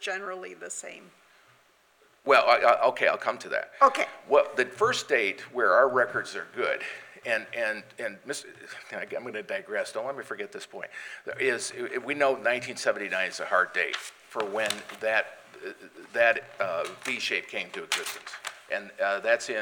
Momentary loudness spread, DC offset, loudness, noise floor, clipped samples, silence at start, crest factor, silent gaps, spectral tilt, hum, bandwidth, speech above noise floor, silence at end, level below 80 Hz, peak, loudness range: 16 LU; under 0.1%; -27 LUFS; -63 dBFS; under 0.1%; 0 s; 22 dB; none; -2 dB/octave; none; 17.5 kHz; 34 dB; 0 s; -80 dBFS; -6 dBFS; 9 LU